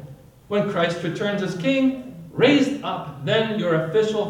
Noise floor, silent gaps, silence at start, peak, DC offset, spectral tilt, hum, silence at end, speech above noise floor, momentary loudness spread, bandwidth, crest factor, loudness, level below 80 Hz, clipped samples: -43 dBFS; none; 0 s; -4 dBFS; under 0.1%; -6 dB/octave; none; 0 s; 22 dB; 11 LU; 12 kHz; 16 dB; -22 LUFS; -60 dBFS; under 0.1%